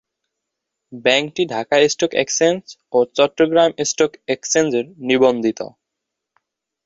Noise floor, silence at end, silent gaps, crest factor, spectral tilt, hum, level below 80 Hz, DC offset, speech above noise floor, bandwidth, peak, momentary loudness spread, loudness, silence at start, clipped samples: -81 dBFS; 1.2 s; none; 18 dB; -3 dB/octave; none; -62 dBFS; under 0.1%; 63 dB; 8 kHz; -2 dBFS; 8 LU; -17 LUFS; 0.9 s; under 0.1%